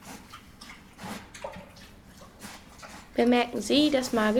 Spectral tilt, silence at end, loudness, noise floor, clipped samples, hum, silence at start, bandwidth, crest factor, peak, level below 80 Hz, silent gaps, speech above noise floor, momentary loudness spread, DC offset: -4 dB/octave; 0 s; -25 LUFS; -50 dBFS; under 0.1%; none; 0.05 s; 17.5 kHz; 20 dB; -10 dBFS; -56 dBFS; none; 26 dB; 23 LU; under 0.1%